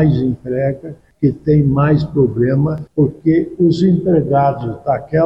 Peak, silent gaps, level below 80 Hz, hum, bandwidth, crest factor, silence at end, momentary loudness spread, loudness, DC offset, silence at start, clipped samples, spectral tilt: -4 dBFS; none; -40 dBFS; none; 7.4 kHz; 12 dB; 0 s; 7 LU; -15 LUFS; 0.1%; 0 s; under 0.1%; -10 dB/octave